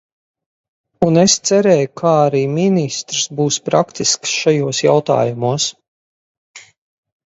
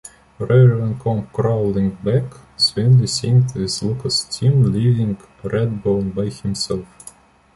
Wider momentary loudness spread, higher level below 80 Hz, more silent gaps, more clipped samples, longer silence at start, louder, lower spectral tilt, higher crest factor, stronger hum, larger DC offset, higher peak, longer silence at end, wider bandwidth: second, 7 LU vs 10 LU; second, -56 dBFS vs -44 dBFS; first, 5.88-6.54 s vs none; neither; first, 1 s vs 0.4 s; first, -15 LUFS vs -18 LUFS; second, -4 dB/octave vs -6 dB/octave; about the same, 16 dB vs 16 dB; neither; neither; about the same, 0 dBFS vs -2 dBFS; about the same, 0.7 s vs 0.7 s; second, 8 kHz vs 11.5 kHz